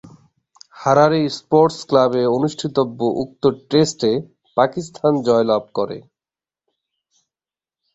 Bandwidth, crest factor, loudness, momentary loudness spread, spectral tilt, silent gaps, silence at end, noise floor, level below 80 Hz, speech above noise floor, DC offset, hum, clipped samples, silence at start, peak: 8 kHz; 18 dB; -18 LUFS; 10 LU; -6 dB/octave; none; 1.95 s; under -90 dBFS; -58 dBFS; over 73 dB; under 0.1%; none; under 0.1%; 0.75 s; -2 dBFS